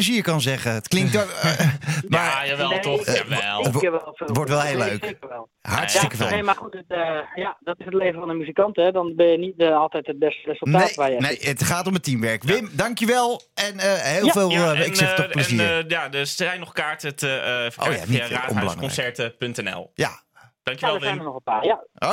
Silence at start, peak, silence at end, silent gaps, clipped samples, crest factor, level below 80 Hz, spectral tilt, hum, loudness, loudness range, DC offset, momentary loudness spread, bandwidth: 0 s; -4 dBFS; 0 s; none; under 0.1%; 18 dB; -60 dBFS; -4.5 dB/octave; none; -22 LUFS; 5 LU; under 0.1%; 8 LU; 17 kHz